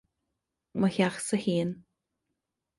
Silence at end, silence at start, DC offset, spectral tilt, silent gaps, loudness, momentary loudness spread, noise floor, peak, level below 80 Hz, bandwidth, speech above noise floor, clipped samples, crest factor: 0.95 s; 0.75 s; under 0.1%; -5.5 dB/octave; none; -29 LUFS; 12 LU; -84 dBFS; -12 dBFS; -66 dBFS; 11.5 kHz; 56 dB; under 0.1%; 20 dB